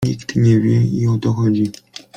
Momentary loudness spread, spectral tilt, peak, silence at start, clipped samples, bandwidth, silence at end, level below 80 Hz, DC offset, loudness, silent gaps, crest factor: 7 LU; -8 dB/octave; -4 dBFS; 0 s; under 0.1%; 9.4 kHz; 0.45 s; -46 dBFS; under 0.1%; -16 LUFS; none; 12 dB